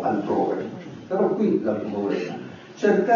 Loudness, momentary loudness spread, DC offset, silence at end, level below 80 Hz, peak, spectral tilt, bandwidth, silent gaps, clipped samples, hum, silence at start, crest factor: -24 LUFS; 14 LU; under 0.1%; 0 s; -66 dBFS; -8 dBFS; -7.5 dB/octave; 7.2 kHz; none; under 0.1%; none; 0 s; 16 dB